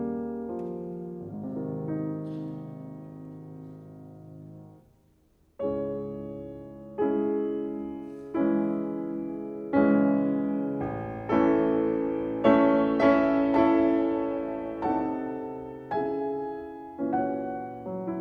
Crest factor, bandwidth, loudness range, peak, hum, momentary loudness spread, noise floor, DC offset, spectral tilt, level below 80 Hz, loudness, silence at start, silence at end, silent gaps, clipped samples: 20 dB; 5.8 kHz; 14 LU; -8 dBFS; none; 20 LU; -64 dBFS; under 0.1%; -9.5 dB/octave; -58 dBFS; -28 LUFS; 0 s; 0 s; none; under 0.1%